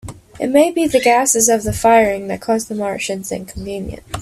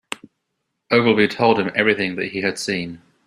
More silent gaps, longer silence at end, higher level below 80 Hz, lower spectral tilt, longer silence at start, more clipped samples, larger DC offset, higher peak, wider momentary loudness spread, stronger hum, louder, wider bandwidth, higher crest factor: neither; second, 0 s vs 0.3 s; first, -40 dBFS vs -58 dBFS; second, -3.5 dB/octave vs -5 dB/octave; about the same, 0.05 s vs 0.1 s; neither; neither; about the same, 0 dBFS vs -2 dBFS; about the same, 14 LU vs 14 LU; neither; first, -15 LUFS vs -19 LUFS; first, 16 kHz vs 13 kHz; about the same, 16 dB vs 18 dB